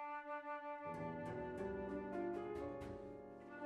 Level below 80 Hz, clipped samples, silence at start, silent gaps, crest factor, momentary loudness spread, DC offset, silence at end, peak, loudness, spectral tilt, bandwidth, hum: -66 dBFS; under 0.1%; 0 s; none; 14 dB; 8 LU; under 0.1%; 0 s; -34 dBFS; -48 LUFS; -8 dB/octave; 12 kHz; none